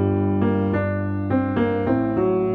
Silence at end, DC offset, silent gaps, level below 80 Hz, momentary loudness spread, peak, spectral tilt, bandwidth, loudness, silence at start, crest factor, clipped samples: 0 s; under 0.1%; none; -48 dBFS; 2 LU; -8 dBFS; -11 dB/octave; 4.3 kHz; -21 LUFS; 0 s; 14 dB; under 0.1%